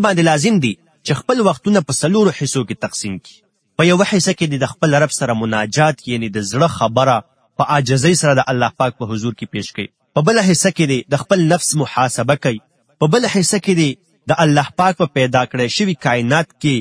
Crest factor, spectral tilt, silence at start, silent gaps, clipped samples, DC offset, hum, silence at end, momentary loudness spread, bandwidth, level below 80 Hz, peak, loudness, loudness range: 16 dB; -5 dB/octave; 0 s; none; under 0.1%; under 0.1%; none; 0 s; 9 LU; 10.5 kHz; -54 dBFS; 0 dBFS; -16 LUFS; 1 LU